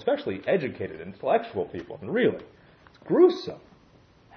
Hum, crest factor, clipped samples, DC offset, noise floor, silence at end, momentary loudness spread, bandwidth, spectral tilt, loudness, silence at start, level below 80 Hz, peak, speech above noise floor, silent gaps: none; 20 dB; under 0.1%; under 0.1%; -57 dBFS; 0.8 s; 17 LU; 6.4 kHz; -7.5 dB/octave; -26 LUFS; 0 s; -64 dBFS; -8 dBFS; 31 dB; none